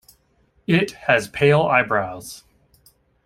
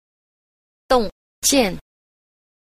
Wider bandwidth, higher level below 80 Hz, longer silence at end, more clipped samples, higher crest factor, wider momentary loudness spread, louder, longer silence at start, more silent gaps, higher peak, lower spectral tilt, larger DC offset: about the same, 16 kHz vs 15 kHz; second, -54 dBFS vs -42 dBFS; about the same, 0.9 s vs 0.9 s; neither; about the same, 20 dB vs 20 dB; first, 19 LU vs 13 LU; about the same, -19 LUFS vs -19 LUFS; second, 0.7 s vs 0.9 s; second, none vs 1.12-1.42 s; about the same, -2 dBFS vs -4 dBFS; first, -6 dB/octave vs -2.5 dB/octave; neither